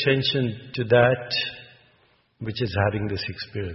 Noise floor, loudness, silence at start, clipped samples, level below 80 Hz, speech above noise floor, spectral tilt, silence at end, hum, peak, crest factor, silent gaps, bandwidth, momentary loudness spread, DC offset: -62 dBFS; -24 LUFS; 0 s; under 0.1%; -46 dBFS; 39 dB; -9 dB/octave; 0 s; none; -4 dBFS; 20 dB; none; 6 kHz; 13 LU; under 0.1%